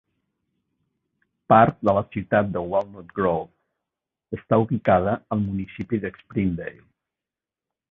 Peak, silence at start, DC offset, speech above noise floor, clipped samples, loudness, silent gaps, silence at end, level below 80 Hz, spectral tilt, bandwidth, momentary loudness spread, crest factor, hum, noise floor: -2 dBFS; 1.5 s; under 0.1%; 67 dB; under 0.1%; -23 LUFS; none; 1.2 s; -50 dBFS; -10 dB/octave; 4.7 kHz; 15 LU; 22 dB; none; -89 dBFS